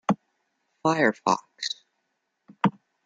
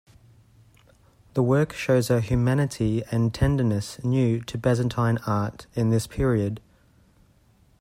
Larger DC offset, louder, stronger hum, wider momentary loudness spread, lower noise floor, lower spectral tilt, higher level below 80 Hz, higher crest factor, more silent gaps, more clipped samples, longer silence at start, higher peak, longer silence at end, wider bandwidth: neither; about the same, -26 LUFS vs -24 LUFS; neither; first, 10 LU vs 5 LU; first, -77 dBFS vs -59 dBFS; second, -5 dB/octave vs -7 dB/octave; second, -72 dBFS vs -44 dBFS; about the same, 22 dB vs 18 dB; neither; neither; second, 0.1 s vs 1.35 s; about the same, -6 dBFS vs -8 dBFS; second, 0.35 s vs 1.2 s; second, 9.4 kHz vs 15.5 kHz